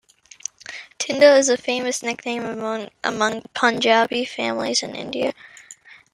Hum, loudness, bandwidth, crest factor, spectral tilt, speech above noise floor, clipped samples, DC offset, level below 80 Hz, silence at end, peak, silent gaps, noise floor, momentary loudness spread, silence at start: none; -20 LUFS; 12 kHz; 20 dB; -2 dB/octave; 26 dB; under 0.1%; under 0.1%; -66 dBFS; 0.4 s; -2 dBFS; none; -46 dBFS; 18 LU; 0.7 s